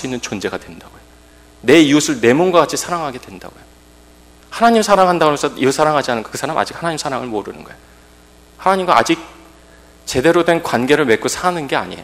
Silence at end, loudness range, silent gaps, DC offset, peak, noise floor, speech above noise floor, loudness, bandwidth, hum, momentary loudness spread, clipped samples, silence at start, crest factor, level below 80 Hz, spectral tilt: 0 s; 4 LU; none; under 0.1%; 0 dBFS; -45 dBFS; 30 dB; -15 LUFS; 16 kHz; none; 14 LU; 0.2%; 0 s; 16 dB; -48 dBFS; -4 dB/octave